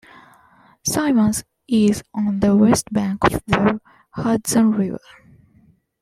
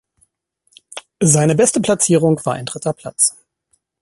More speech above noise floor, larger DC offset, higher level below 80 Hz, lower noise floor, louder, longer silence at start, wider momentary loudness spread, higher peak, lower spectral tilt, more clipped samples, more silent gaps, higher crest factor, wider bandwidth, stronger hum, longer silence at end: second, 38 dB vs 50 dB; neither; first, -44 dBFS vs -54 dBFS; second, -55 dBFS vs -65 dBFS; second, -19 LUFS vs -15 LUFS; about the same, 0.85 s vs 0.95 s; second, 11 LU vs 15 LU; about the same, -2 dBFS vs 0 dBFS; about the same, -5 dB/octave vs -4.5 dB/octave; neither; neither; about the same, 18 dB vs 18 dB; first, 15.5 kHz vs 12 kHz; neither; first, 1.05 s vs 0.7 s